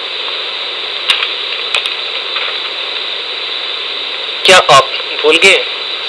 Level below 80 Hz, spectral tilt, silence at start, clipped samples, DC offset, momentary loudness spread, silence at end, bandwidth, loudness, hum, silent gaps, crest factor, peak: -58 dBFS; -1 dB/octave; 0 s; 0.3%; under 0.1%; 11 LU; 0 s; 11 kHz; -11 LUFS; none; none; 14 dB; 0 dBFS